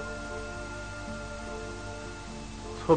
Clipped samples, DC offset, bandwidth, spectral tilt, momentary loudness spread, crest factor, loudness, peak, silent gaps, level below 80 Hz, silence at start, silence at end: under 0.1%; 0.1%; 9.4 kHz; -5.5 dB/octave; 4 LU; 24 dB; -39 LUFS; -10 dBFS; none; -46 dBFS; 0 s; 0 s